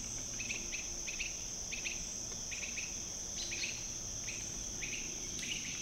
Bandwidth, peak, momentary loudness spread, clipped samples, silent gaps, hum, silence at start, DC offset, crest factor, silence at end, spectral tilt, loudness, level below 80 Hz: 16 kHz; -24 dBFS; 2 LU; under 0.1%; none; none; 0 s; under 0.1%; 16 dB; 0 s; -0.5 dB/octave; -39 LUFS; -54 dBFS